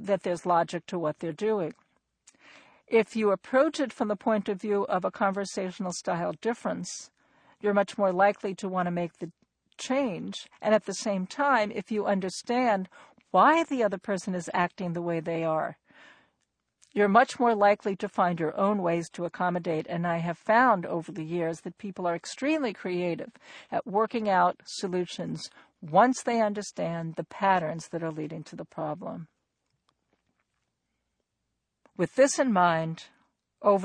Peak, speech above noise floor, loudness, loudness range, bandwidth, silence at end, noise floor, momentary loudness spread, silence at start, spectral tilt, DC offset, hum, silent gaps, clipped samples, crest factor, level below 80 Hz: -6 dBFS; 55 dB; -28 LUFS; 6 LU; 10 kHz; 0 s; -82 dBFS; 13 LU; 0 s; -5.5 dB/octave; under 0.1%; none; none; under 0.1%; 22 dB; -72 dBFS